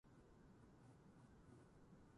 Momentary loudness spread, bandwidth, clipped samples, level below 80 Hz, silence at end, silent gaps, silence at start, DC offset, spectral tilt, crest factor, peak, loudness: 2 LU; 11 kHz; under 0.1%; -76 dBFS; 0 s; none; 0.05 s; under 0.1%; -7 dB/octave; 12 dB; -54 dBFS; -68 LUFS